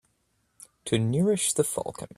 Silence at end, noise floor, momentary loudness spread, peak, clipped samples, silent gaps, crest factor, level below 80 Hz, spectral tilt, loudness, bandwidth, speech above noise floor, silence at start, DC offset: 0.1 s; -72 dBFS; 9 LU; -8 dBFS; under 0.1%; none; 20 dB; -60 dBFS; -4.5 dB/octave; -26 LUFS; 15 kHz; 46 dB; 0.85 s; under 0.1%